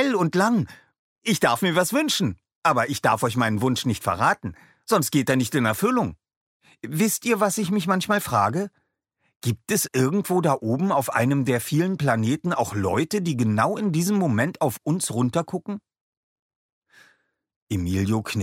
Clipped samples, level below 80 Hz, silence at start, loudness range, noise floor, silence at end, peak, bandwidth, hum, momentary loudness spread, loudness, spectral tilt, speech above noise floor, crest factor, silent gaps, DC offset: under 0.1%; -58 dBFS; 0 s; 3 LU; -73 dBFS; 0 s; -6 dBFS; 16.5 kHz; none; 8 LU; -23 LUFS; -5 dB/octave; 50 dB; 18 dB; 0.99-1.16 s, 2.55-2.62 s, 6.36-6.60 s, 9.36-9.40 s, 16.01-16.82 s, 17.56-17.67 s; under 0.1%